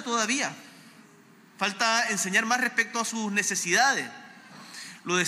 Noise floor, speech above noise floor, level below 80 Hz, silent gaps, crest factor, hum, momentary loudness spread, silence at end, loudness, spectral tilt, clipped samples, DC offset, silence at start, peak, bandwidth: -55 dBFS; 28 dB; -84 dBFS; none; 18 dB; none; 19 LU; 0 s; -25 LUFS; -1.5 dB/octave; under 0.1%; under 0.1%; 0 s; -10 dBFS; 16 kHz